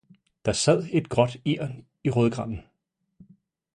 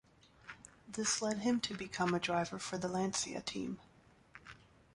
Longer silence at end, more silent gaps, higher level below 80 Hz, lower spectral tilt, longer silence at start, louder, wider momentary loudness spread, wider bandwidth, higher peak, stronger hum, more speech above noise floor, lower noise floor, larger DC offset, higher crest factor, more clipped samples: first, 1.15 s vs 0.4 s; neither; first, -52 dBFS vs -68 dBFS; first, -5.5 dB/octave vs -3.5 dB/octave; about the same, 0.45 s vs 0.45 s; first, -25 LUFS vs -37 LUFS; second, 12 LU vs 21 LU; about the same, 11 kHz vs 11.5 kHz; first, -4 dBFS vs -20 dBFS; neither; first, 53 dB vs 24 dB; first, -77 dBFS vs -61 dBFS; neither; about the same, 22 dB vs 18 dB; neither